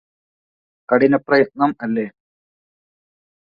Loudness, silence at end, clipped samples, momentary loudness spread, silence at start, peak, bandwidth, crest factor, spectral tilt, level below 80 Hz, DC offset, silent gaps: -18 LUFS; 1.3 s; under 0.1%; 9 LU; 0.9 s; -2 dBFS; 5.2 kHz; 20 dB; -9 dB/octave; -62 dBFS; under 0.1%; none